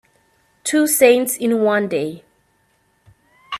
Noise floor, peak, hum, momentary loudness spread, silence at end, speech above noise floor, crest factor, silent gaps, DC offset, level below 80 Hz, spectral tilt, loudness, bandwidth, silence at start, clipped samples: -62 dBFS; 0 dBFS; none; 12 LU; 0 s; 46 dB; 20 dB; none; under 0.1%; -64 dBFS; -3.5 dB/octave; -17 LUFS; 15.5 kHz; 0.65 s; under 0.1%